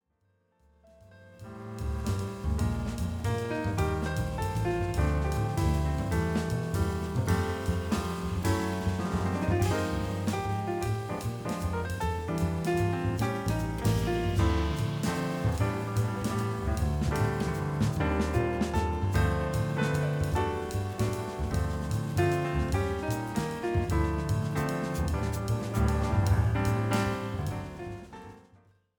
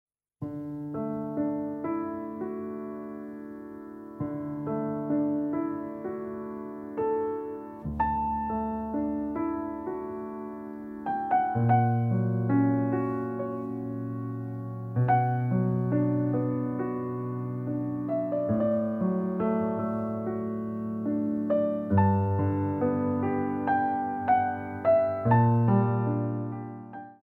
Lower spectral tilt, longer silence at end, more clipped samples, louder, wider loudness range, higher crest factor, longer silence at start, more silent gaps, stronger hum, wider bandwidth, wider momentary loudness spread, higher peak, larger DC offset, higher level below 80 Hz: second, -6.5 dB/octave vs -11.5 dB/octave; first, 0.6 s vs 0.1 s; neither; about the same, -30 LUFS vs -29 LUFS; second, 2 LU vs 7 LU; about the same, 16 dB vs 18 dB; first, 1.1 s vs 0.4 s; neither; neither; first, 19.5 kHz vs 3.2 kHz; second, 5 LU vs 13 LU; second, -14 dBFS vs -10 dBFS; neither; first, -38 dBFS vs -56 dBFS